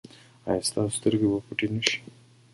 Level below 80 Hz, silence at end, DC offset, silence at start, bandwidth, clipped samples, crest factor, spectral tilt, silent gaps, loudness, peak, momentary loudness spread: -58 dBFS; 0.5 s; under 0.1%; 0.45 s; 12 kHz; under 0.1%; 26 dB; -4 dB/octave; none; -27 LUFS; -2 dBFS; 7 LU